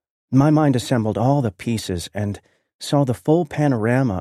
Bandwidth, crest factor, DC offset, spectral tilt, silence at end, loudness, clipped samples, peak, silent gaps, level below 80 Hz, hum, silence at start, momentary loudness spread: 13.5 kHz; 16 dB; under 0.1%; -7 dB/octave; 0 s; -20 LUFS; under 0.1%; -4 dBFS; 2.75-2.79 s; -50 dBFS; none; 0.3 s; 11 LU